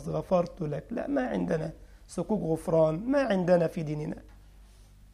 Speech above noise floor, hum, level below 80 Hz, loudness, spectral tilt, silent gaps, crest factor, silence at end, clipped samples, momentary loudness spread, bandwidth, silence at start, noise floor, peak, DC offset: 25 dB; 50 Hz at -50 dBFS; -52 dBFS; -29 LUFS; -7.5 dB/octave; none; 18 dB; 0.3 s; under 0.1%; 12 LU; 14.5 kHz; 0 s; -54 dBFS; -12 dBFS; under 0.1%